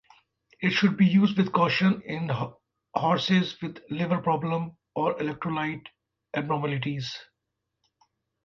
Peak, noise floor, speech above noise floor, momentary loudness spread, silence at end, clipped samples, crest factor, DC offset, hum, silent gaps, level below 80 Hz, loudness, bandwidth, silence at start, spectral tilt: -8 dBFS; -83 dBFS; 57 dB; 13 LU; 1.2 s; under 0.1%; 20 dB; under 0.1%; none; none; -66 dBFS; -26 LUFS; 6.8 kHz; 0.6 s; -7 dB/octave